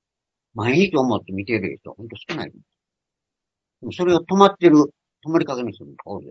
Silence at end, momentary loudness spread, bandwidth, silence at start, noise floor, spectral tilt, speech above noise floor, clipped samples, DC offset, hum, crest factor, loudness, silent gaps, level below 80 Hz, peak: 0 s; 22 LU; 7.6 kHz; 0.55 s; -85 dBFS; -6.5 dB/octave; 66 dB; under 0.1%; under 0.1%; none; 22 dB; -19 LUFS; none; -60 dBFS; 0 dBFS